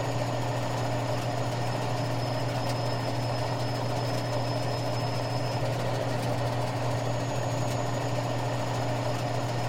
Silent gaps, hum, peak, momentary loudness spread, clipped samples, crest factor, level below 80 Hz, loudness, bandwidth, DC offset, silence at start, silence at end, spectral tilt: none; none; -16 dBFS; 1 LU; under 0.1%; 12 dB; -52 dBFS; -30 LUFS; 16 kHz; under 0.1%; 0 s; 0 s; -5.5 dB/octave